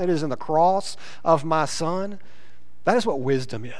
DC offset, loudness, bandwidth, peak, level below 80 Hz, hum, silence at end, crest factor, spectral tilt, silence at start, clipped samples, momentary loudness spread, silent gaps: 3%; -23 LUFS; 11 kHz; -4 dBFS; -62 dBFS; none; 0 s; 20 dB; -5.5 dB/octave; 0 s; under 0.1%; 10 LU; none